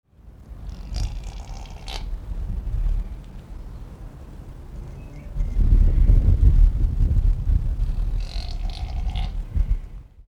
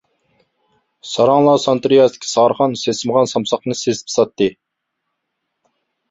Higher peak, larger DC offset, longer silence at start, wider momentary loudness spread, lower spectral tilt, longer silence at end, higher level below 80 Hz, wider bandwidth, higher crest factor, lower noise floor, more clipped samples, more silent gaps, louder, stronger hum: about the same, -4 dBFS vs -2 dBFS; neither; second, 0.25 s vs 1.05 s; first, 21 LU vs 8 LU; first, -7 dB/octave vs -4.5 dB/octave; second, 0.05 s vs 1.6 s; first, -22 dBFS vs -60 dBFS; second, 6.8 kHz vs 8 kHz; about the same, 18 dB vs 16 dB; second, -43 dBFS vs -76 dBFS; neither; neither; second, -25 LUFS vs -16 LUFS; neither